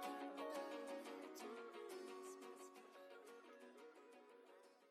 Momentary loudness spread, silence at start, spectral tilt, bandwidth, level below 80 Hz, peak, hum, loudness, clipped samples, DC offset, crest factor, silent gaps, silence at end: 15 LU; 0 s; -2.5 dB/octave; 16 kHz; under -90 dBFS; -38 dBFS; none; -55 LUFS; under 0.1%; under 0.1%; 18 dB; none; 0 s